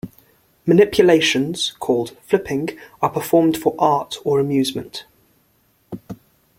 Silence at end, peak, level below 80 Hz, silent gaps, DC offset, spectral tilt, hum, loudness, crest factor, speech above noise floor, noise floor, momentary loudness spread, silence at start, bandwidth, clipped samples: 0.45 s; -2 dBFS; -54 dBFS; none; under 0.1%; -5 dB/octave; none; -18 LUFS; 18 dB; 43 dB; -61 dBFS; 21 LU; 0.05 s; 16.5 kHz; under 0.1%